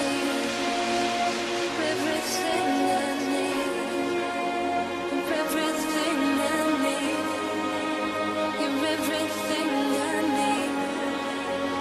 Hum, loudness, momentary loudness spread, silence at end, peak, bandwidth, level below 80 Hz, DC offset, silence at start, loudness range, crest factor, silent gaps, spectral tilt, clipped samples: none; -26 LUFS; 4 LU; 0 s; -14 dBFS; 14 kHz; -62 dBFS; under 0.1%; 0 s; 1 LU; 14 dB; none; -3 dB/octave; under 0.1%